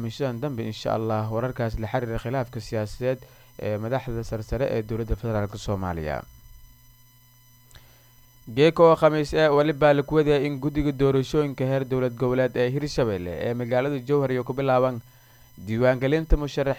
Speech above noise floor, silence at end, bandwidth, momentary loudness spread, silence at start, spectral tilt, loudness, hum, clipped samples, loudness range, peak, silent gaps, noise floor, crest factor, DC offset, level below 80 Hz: 31 dB; 0 s; 19 kHz; 11 LU; 0 s; -7 dB/octave; -24 LUFS; none; under 0.1%; 9 LU; -6 dBFS; none; -55 dBFS; 20 dB; under 0.1%; -38 dBFS